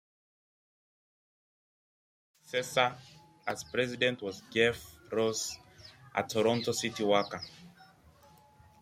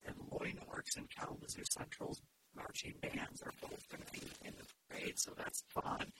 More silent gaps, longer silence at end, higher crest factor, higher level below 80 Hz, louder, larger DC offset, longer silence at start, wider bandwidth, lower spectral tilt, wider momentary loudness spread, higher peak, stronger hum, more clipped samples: neither; first, 0.95 s vs 0 s; about the same, 24 dB vs 24 dB; about the same, -70 dBFS vs -68 dBFS; first, -32 LUFS vs -45 LUFS; neither; first, 2.5 s vs 0 s; about the same, 16 kHz vs 16.5 kHz; about the same, -3.5 dB/octave vs -2.5 dB/octave; first, 14 LU vs 11 LU; first, -12 dBFS vs -24 dBFS; neither; neither